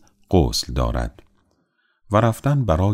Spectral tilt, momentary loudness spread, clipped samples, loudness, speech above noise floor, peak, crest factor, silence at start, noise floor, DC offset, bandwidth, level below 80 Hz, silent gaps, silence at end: -6 dB/octave; 7 LU; under 0.1%; -21 LUFS; 48 dB; -2 dBFS; 20 dB; 0.3 s; -67 dBFS; under 0.1%; 16 kHz; -30 dBFS; none; 0 s